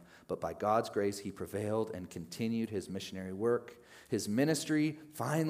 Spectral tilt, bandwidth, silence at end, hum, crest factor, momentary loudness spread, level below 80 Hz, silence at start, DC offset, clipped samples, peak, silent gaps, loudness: -5.5 dB/octave; 15.5 kHz; 0 s; none; 18 dB; 11 LU; -74 dBFS; 0 s; under 0.1%; under 0.1%; -16 dBFS; none; -35 LUFS